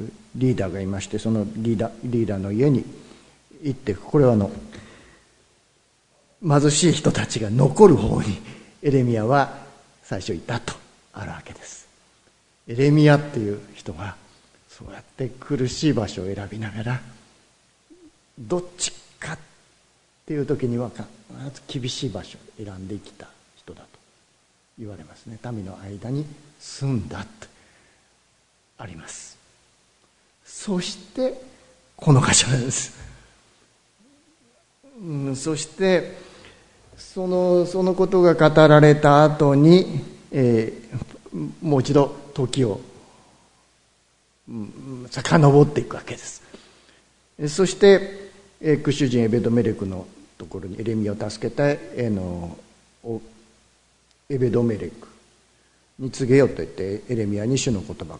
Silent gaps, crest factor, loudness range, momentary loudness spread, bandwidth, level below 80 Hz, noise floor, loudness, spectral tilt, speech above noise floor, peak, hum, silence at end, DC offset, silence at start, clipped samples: none; 22 dB; 15 LU; 23 LU; 10.5 kHz; -50 dBFS; -63 dBFS; -21 LUFS; -6 dB/octave; 42 dB; 0 dBFS; none; 0 s; under 0.1%; 0 s; under 0.1%